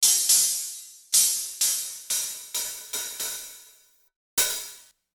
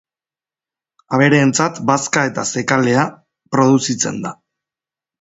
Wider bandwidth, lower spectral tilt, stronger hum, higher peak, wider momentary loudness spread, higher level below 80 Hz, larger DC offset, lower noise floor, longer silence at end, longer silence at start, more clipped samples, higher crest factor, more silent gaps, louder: first, over 20 kHz vs 8 kHz; second, 3.5 dB/octave vs -4.5 dB/octave; neither; second, -6 dBFS vs 0 dBFS; first, 16 LU vs 8 LU; second, -68 dBFS vs -58 dBFS; neither; second, -58 dBFS vs under -90 dBFS; second, 0.35 s vs 0.9 s; second, 0 s vs 1.1 s; neither; about the same, 20 dB vs 18 dB; first, 4.16-4.37 s vs none; second, -23 LUFS vs -16 LUFS